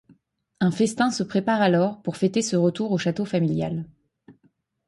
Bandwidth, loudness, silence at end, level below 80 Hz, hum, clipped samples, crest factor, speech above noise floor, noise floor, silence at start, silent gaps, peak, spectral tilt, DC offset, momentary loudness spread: 11.5 kHz; -23 LUFS; 0.55 s; -62 dBFS; none; under 0.1%; 16 dB; 43 dB; -65 dBFS; 0.6 s; none; -8 dBFS; -6 dB/octave; under 0.1%; 6 LU